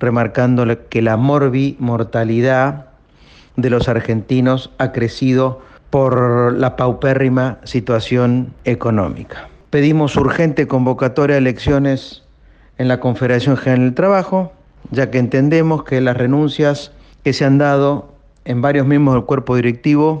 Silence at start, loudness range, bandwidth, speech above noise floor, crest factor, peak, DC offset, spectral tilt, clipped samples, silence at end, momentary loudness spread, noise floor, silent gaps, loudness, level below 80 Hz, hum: 0 s; 2 LU; 8.2 kHz; 32 dB; 12 dB; -4 dBFS; under 0.1%; -8 dB/octave; under 0.1%; 0 s; 7 LU; -46 dBFS; none; -15 LUFS; -42 dBFS; none